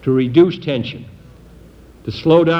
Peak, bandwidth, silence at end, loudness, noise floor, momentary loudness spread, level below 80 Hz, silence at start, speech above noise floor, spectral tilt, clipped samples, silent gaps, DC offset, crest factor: 0 dBFS; 6.2 kHz; 0 s; -16 LUFS; -42 dBFS; 18 LU; -46 dBFS; 0.05 s; 27 dB; -8.5 dB/octave; under 0.1%; none; under 0.1%; 16 dB